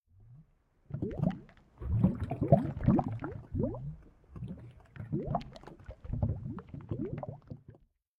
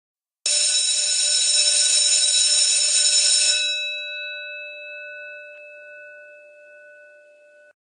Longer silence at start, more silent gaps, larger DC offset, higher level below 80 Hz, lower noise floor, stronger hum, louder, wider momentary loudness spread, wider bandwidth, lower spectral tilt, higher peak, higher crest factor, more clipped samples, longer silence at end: second, 0.2 s vs 0.45 s; neither; neither; first, -48 dBFS vs under -90 dBFS; first, -65 dBFS vs -51 dBFS; neither; second, -34 LUFS vs -16 LUFS; about the same, 22 LU vs 20 LU; second, 5.4 kHz vs 11 kHz; first, -11 dB/octave vs 8 dB/octave; second, -10 dBFS vs -4 dBFS; first, 26 dB vs 18 dB; neither; second, 0.45 s vs 1.45 s